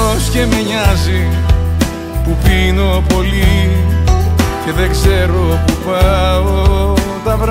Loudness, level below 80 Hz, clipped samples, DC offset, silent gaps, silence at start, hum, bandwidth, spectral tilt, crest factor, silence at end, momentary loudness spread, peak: -13 LUFS; -14 dBFS; under 0.1%; under 0.1%; none; 0 s; none; 16.5 kHz; -5.5 dB/octave; 12 dB; 0 s; 4 LU; 0 dBFS